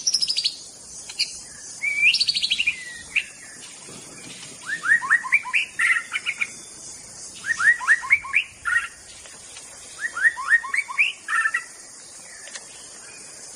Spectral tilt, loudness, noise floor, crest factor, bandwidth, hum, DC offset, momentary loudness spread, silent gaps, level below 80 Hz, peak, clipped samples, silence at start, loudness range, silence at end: 2 dB/octave; -21 LUFS; -43 dBFS; 20 dB; 15 kHz; none; under 0.1%; 21 LU; none; -62 dBFS; -4 dBFS; under 0.1%; 0 s; 2 LU; 0 s